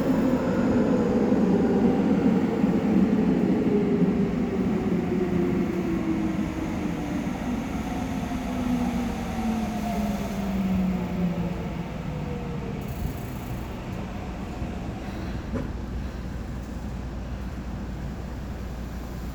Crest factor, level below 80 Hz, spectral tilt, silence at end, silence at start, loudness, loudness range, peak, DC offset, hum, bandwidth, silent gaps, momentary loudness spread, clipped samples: 16 dB; -38 dBFS; -7.5 dB/octave; 0 s; 0 s; -27 LUFS; 11 LU; -10 dBFS; under 0.1%; none; over 20 kHz; none; 13 LU; under 0.1%